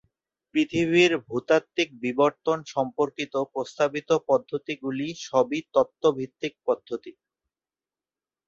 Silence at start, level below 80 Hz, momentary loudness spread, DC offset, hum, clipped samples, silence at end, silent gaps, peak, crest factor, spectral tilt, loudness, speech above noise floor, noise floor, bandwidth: 0.55 s; -66 dBFS; 9 LU; under 0.1%; none; under 0.1%; 1.35 s; none; -6 dBFS; 20 dB; -5 dB/octave; -25 LUFS; over 65 dB; under -90 dBFS; 7.8 kHz